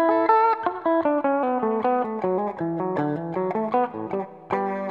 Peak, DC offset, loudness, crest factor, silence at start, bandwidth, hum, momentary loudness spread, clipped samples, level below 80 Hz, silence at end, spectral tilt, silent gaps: -6 dBFS; under 0.1%; -24 LUFS; 18 dB; 0 s; 5.6 kHz; none; 8 LU; under 0.1%; -68 dBFS; 0 s; -9.5 dB/octave; none